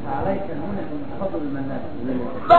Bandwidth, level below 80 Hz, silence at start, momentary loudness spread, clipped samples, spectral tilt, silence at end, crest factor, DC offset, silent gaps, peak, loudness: 7.4 kHz; -46 dBFS; 0 s; 5 LU; under 0.1%; -8.5 dB/octave; 0 s; 20 dB; 4%; none; -2 dBFS; -28 LUFS